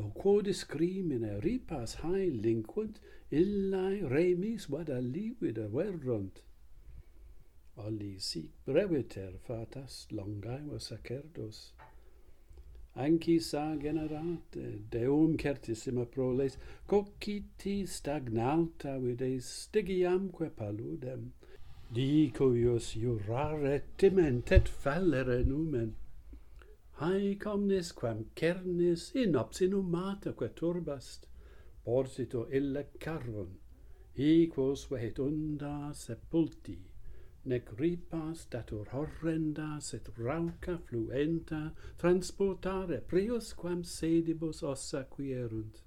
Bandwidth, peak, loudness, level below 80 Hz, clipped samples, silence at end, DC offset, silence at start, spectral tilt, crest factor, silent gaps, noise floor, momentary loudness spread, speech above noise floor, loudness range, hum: 14 kHz; -10 dBFS; -34 LUFS; -46 dBFS; under 0.1%; 0.05 s; under 0.1%; 0 s; -7 dB/octave; 24 dB; none; -55 dBFS; 13 LU; 21 dB; 7 LU; none